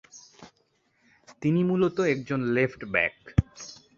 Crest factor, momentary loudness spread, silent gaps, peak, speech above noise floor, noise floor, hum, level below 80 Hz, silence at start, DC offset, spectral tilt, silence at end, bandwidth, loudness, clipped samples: 22 dB; 12 LU; none; -6 dBFS; 44 dB; -70 dBFS; none; -44 dBFS; 0.15 s; under 0.1%; -7 dB/octave; 0.25 s; 7.4 kHz; -26 LUFS; under 0.1%